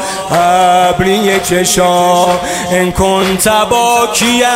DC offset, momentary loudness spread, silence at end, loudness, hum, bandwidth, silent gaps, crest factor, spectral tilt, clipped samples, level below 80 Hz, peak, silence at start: under 0.1%; 4 LU; 0 s; -10 LUFS; none; 16.5 kHz; none; 10 dB; -3.5 dB/octave; under 0.1%; -34 dBFS; 0 dBFS; 0 s